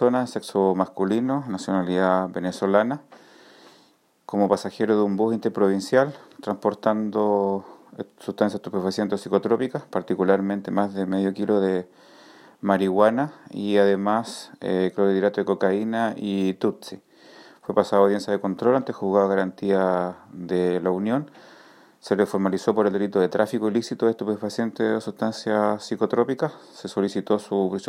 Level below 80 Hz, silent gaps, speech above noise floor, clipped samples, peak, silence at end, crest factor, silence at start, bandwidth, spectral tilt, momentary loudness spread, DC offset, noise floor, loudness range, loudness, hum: -72 dBFS; none; 37 dB; under 0.1%; -4 dBFS; 0 s; 20 dB; 0 s; 14.5 kHz; -6.5 dB/octave; 9 LU; under 0.1%; -60 dBFS; 2 LU; -23 LUFS; none